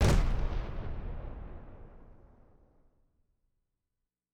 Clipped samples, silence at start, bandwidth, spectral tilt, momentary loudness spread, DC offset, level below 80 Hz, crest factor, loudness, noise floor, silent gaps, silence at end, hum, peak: under 0.1%; 0 s; 13.5 kHz; -6 dB/octave; 24 LU; under 0.1%; -36 dBFS; 20 dB; -36 LUFS; -87 dBFS; none; 2.2 s; none; -14 dBFS